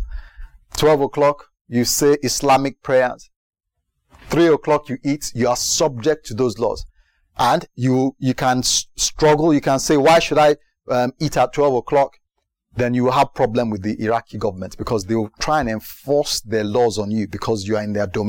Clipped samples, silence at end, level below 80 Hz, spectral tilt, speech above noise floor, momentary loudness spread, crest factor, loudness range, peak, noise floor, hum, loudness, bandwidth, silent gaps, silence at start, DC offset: under 0.1%; 0 s; -42 dBFS; -4.5 dB/octave; 56 dB; 9 LU; 12 dB; 5 LU; -6 dBFS; -74 dBFS; none; -18 LUFS; 17 kHz; 1.61-1.65 s, 3.36-3.51 s; 0 s; under 0.1%